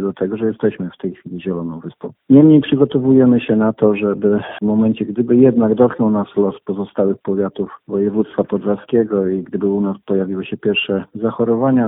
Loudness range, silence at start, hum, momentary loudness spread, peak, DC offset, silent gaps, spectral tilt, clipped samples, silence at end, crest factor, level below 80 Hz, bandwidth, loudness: 5 LU; 0 s; none; 13 LU; 0 dBFS; under 0.1%; none; -12.5 dB/octave; under 0.1%; 0 s; 16 dB; -56 dBFS; 3.9 kHz; -16 LUFS